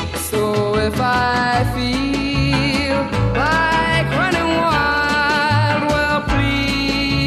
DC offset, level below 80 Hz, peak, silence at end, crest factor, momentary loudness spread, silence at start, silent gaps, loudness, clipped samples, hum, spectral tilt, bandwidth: under 0.1%; -30 dBFS; -4 dBFS; 0 s; 14 dB; 3 LU; 0 s; none; -17 LUFS; under 0.1%; none; -5 dB/octave; 14 kHz